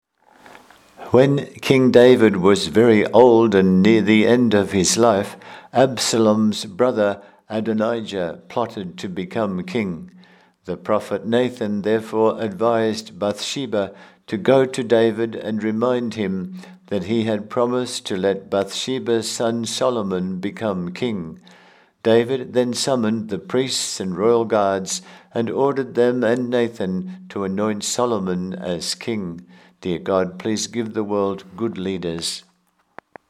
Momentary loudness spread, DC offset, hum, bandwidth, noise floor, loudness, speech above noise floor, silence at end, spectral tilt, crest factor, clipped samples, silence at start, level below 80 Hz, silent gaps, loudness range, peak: 13 LU; under 0.1%; none; 15 kHz; -63 dBFS; -20 LUFS; 44 dB; 0.9 s; -5 dB/octave; 20 dB; under 0.1%; 1 s; -60 dBFS; none; 9 LU; 0 dBFS